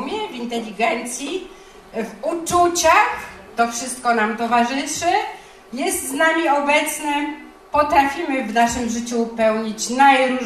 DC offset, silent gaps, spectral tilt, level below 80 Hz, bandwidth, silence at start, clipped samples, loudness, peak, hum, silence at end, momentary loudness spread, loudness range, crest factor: under 0.1%; none; -2.5 dB/octave; -50 dBFS; 15 kHz; 0 s; under 0.1%; -19 LUFS; -2 dBFS; none; 0 s; 15 LU; 2 LU; 18 dB